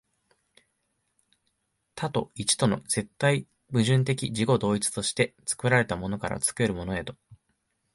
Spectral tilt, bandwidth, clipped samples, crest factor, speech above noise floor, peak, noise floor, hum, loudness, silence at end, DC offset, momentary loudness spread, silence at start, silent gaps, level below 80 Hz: -4.5 dB/octave; 12 kHz; under 0.1%; 20 dB; 50 dB; -8 dBFS; -76 dBFS; none; -27 LUFS; 0.6 s; under 0.1%; 8 LU; 1.95 s; none; -54 dBFS